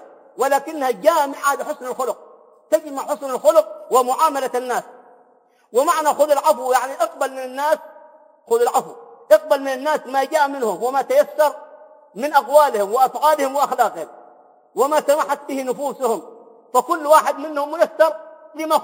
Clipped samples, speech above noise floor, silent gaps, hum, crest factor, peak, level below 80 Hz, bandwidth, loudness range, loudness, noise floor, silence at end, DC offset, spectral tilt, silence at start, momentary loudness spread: under 0.1%; 38 dB; none; none; 20 dB; 0 dBFS; -80 dBFS; 17 kHz; 3 LU; -19 LUFS; -56 dBFS; 0 s; under 0.1%; -2.5 dB/octave; 0.35 s; 10 LU